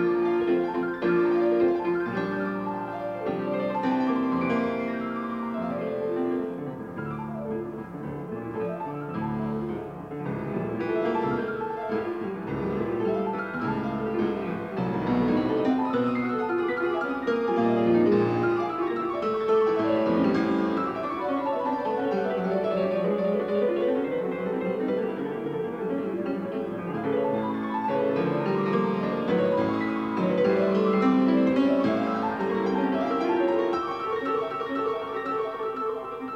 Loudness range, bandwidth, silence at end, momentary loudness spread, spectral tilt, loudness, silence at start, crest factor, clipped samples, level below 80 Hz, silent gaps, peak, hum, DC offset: 7 LU; 7 kHz; 0 s; 9 LU; -8.5 dB/octave; -27 LUFS; 0 s; 14 dB; under 0.1%; -58 dBFS; none; -12 dBFS; none; under 0.1%